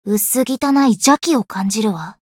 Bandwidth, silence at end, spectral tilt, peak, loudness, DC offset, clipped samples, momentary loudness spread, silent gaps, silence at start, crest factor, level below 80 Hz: 17.5 kHz; 0.15 s; -4 dB/octave; -2 dBFS; -16 LUFS; under 0.1%; under 0.1%; 7 LU; none; 0.05 s; 16 dB; -60 dBFS